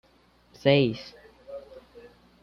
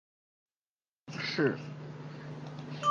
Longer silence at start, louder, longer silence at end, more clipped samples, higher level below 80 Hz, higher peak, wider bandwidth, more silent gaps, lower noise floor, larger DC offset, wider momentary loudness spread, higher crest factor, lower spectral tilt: second, 0.65 s vs 1.05 s; first, -24 LUFS vs -36 LUFS; first, 0.65 s vs 0 s; neither; first, -62 dBFS vs -76 dBFS; first, -8 dBFS vs -16 dBFS; second, 6.6 kHz vs 9.8 kHz; neither; second, -61 dBFS vs under -90 dBFS; neither; first, 24 LU vs 14 LU; about the same, 22 dB vs 20 dB; first, -7.5 dB/octave vs -5.5 dB/octave